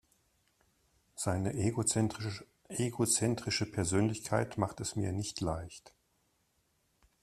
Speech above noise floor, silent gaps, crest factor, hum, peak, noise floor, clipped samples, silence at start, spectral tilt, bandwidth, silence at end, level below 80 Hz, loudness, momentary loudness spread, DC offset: 42 dB; none; 22 dB; none; -14 dBFS; -76 dBFS; under 0.1%; 1.15 s; -4.5 dB/octave; 14 kHz; 1.35 s; -60 dBFS; -34 LUFS; 12 LU; under 0.1%